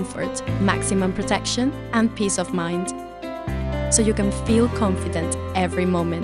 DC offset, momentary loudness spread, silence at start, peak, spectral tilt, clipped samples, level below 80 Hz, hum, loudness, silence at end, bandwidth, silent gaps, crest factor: under 0.1%; 8 LU; 0 s; -4 dBFS; -4.5 dB/octave; under 0.1%; -36 dBFS; none; -22 LUFS; 0 s; 13 kHz; none; 18 dB